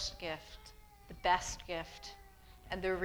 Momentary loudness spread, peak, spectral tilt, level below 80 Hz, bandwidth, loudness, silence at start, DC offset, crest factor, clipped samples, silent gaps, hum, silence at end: 24 LU; -16 dBFS; -3 dB/octave; -54 dBFS; over 20 kHz; -38 LUFS; 0 s; under 0.1%; 22 dB; under 0.1%; none; none; 0 s